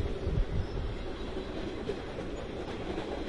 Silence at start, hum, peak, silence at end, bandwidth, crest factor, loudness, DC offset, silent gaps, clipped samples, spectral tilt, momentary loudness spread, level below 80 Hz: 0 s; none; -18 dBFS; 0 s; 11 kHz; 16 dB; -37 LUFS; 0.3%; none; under 0.1%; -7 dB/octave; 5 LU; -38 dBFS